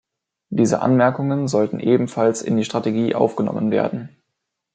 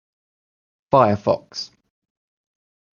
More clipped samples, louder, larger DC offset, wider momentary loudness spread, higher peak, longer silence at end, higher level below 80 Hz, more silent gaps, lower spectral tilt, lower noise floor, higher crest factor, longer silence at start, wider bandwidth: neither; about the same, -19 LUFS vs -19 LUFS; neither; second, 5 LU vs 16 LU; about the same, -2 dBFS vs -2 dBFS; second, 0.7 s vs 1.3 s; about the same, -64 dBFS vs -60 dBFS; neither; about the same, -6.5 dB/octave vs -6.5 dB/octave; second, -78 dBFS vs under -90 dBFS; about the same, 18 dB vs 22 dB; second, 0.5 s vs 0.9 s; first, 9.2 kHz vs 7.2 kHz